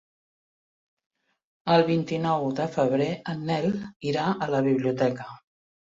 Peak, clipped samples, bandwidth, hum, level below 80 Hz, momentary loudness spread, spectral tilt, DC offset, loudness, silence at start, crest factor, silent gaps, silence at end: -6 dBFS; under 0.1%; 7.8 kHz; none; -66 dBFS; 9 LU; -7 dB/octave; under 0.1%; -26 LUFS; 1.65 s; 20 dB; 3.96-4.00 s; 0.6 s